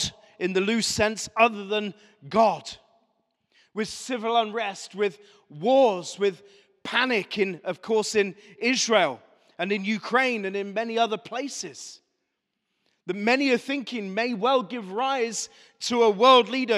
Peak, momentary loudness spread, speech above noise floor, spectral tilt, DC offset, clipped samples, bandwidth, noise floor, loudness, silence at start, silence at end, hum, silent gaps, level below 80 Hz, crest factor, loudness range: -4 dBFS; 13 LU; 55 dB; -3 dB/octave; under 0.1%; under 0.1%; 13.5 kHz; -80 dBFS; -24 LUFS; 0 s; 0 s; none; none; -64 dBFS; 22 dB; 3 LU